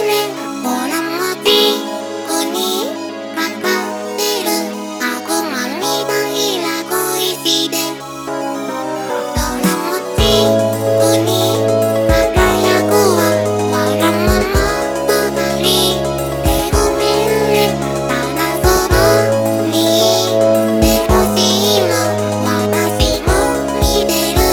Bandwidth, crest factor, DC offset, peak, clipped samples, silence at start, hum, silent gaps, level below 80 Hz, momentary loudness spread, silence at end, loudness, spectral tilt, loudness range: over 20 kHz; 14 dB; under 0.1%; 0 dBFS; under 0.1%; 0 s; none; none; -28 dBFS; 8 LU; 0 s; -14 LUFS; -4 dB/octave; 5 LU